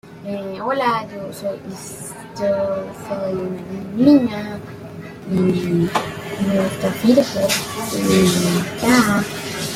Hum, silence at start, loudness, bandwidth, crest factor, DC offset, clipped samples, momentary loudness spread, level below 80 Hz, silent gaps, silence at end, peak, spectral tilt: none; 0.05 s; -19 LUFS; 16.5 kHz; 18 dB; under 0.1%; under 0.1%; 16 LU; -50 dBFS; none; 0 s; -2 dBFS; -5 dB/octave